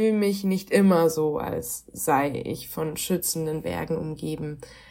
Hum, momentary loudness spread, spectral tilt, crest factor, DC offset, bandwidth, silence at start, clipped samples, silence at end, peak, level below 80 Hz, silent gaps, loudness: none; 12 LU; -5.5 dB/octave; 18 dB; under 0.1%; 16.5 kHz; 0 s; under 0.1%; 0.1 s; -8 dBFS; -54 dBFS; none; -25 LUFS